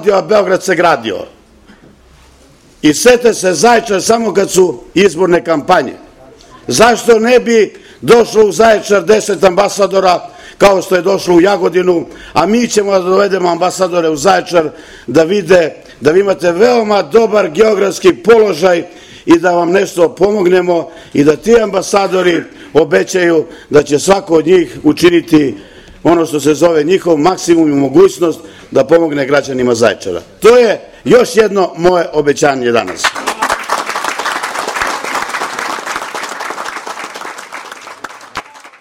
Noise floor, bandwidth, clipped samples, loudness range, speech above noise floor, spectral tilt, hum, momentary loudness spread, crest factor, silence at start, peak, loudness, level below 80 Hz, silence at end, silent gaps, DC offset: -43 dBFS; 16.5 kHz; 1%; 4 LU; 33 dB; -4.5 dB/octave; none; 12 LU; 10 dB; 0 s; 0 dBFS; -11 LUFS; -44 dBFS; 0.1 s; none; under 0.1%